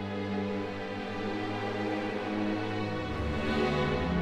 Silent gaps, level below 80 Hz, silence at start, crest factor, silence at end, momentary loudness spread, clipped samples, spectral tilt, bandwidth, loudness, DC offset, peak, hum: none; -46 dBFS; 0 s; 14 dB; 0 s; 6 LU; under 0.1%; -7 dB/octave; 11.5 kHz; -32 LUFS; under 0.1%; -16 dBFS; none